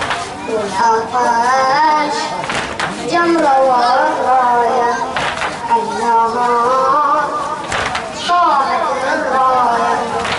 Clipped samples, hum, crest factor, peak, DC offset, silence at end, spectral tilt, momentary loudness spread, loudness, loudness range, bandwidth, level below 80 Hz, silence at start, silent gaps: under 0.1%; none; 12 dB; -2 dBFS; under 0.1%; 0 s; -3.5 dB/octave; 7 LU; -14 LUFS; 1 LU; 11.5 kHz; -46 dBFS; 0 s; none